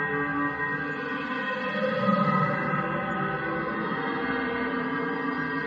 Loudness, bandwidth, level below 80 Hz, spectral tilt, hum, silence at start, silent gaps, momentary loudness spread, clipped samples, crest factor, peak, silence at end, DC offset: -27 LUFS; 7.2 kHz; -58 dBFS; -8 dB/octave; none; 0 s; none; 5 LU; under 0.1%; 16 dB; -10 dBFS; 0 s; under 0.1%